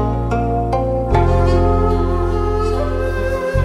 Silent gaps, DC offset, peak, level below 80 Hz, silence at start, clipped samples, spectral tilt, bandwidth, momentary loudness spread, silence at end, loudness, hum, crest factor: none; under 0.1%; -2 dBFS; -22 dBFS; 0 s; under 0.1%; -8 dB/octave; 10.5 kHz; 5 LU; 0 s; -17 LUFS; none; 12 dB